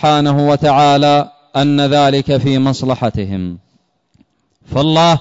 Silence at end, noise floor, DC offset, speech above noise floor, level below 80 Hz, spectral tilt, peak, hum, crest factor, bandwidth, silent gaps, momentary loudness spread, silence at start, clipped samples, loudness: 0 s; -59 dBFS; under 0.1%; 47 dB; -44 dBFS; -6.5 dB/octave; -2 dBFS; none; 10 dB; 7.8 kHz; none; 11 LU; 0 s; under 0.1%; -13 LUFS